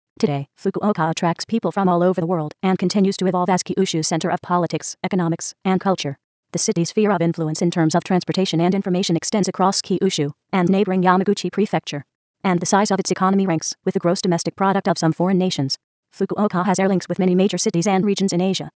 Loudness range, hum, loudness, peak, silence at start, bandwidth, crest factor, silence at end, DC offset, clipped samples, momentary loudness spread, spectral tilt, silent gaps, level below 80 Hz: 2 LU; none; -20 LUFS; -2 dBFS; 0.2 s; 8 kHz; 16 dB; 0.1 s; under 0.1%; under 0.1%; 6 LU; -5.5 dB/octave; 6.24-6.43 s, 12.15-12.34 s, 15.84-16.03 s; -66 dBFS